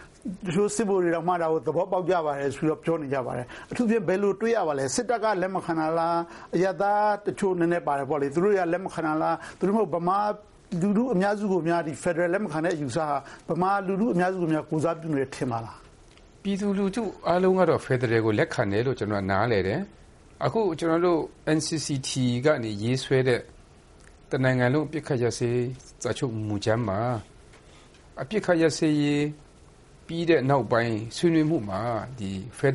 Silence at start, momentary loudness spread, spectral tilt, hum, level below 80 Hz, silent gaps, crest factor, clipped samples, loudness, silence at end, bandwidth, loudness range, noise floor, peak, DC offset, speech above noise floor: 0 s; 8 LU; -6 dB/octave; none; -56 dBFS; none; 18 dB; under 0.1%; -26 LUFS; 0 s; 11.5 kHz; 3 LU; -52 dBFS; -8 dBFS; under 0.1%; 27 dB